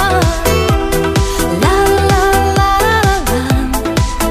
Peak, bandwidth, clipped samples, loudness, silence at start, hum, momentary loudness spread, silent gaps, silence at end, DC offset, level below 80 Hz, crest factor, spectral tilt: 0 dBFS; 16 kHz; under 0.1%; -13 LUFS; 0 s; none; 4 LU; none; 0 s; under 0.1%; -20 dBFS; 12 dB; -5 dB/octave